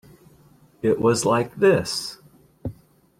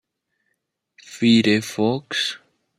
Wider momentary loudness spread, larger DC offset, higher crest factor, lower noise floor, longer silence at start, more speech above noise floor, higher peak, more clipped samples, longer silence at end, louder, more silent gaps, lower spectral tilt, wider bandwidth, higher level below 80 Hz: first, 18 LU vs 9 LU; neither; about the same, 18 dB vs 18 dB; second, -54 dBFS vs -75 dBFS; second, 0.85 s vs 1.1 s; second, 34 dB vs 56 dB; about the same, -6 dBFS vs -4 dBFS; neither; about the same, 0.45 s vs 0.4 s; about the same, -21 LUFS vs -20 LUFS; neither; about the same, -5 dB/octave vs -4.5 dB/octave; about the same, 15.5 kHz vs 14.5 kHz; first, -56 dBFS vs -66 dBFS